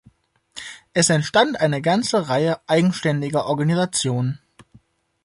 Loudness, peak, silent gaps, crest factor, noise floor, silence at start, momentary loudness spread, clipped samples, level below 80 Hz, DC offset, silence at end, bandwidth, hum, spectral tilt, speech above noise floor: -20 LUFS; -2 dBFS; none; 18 dB; -56 dBFS; 0.55 s; 17 LU; under 0.1%; -60 dBFS; under 0.1%; 0.9 s; 11.5 kHz; none; -4.5 dB/octave; 37 dB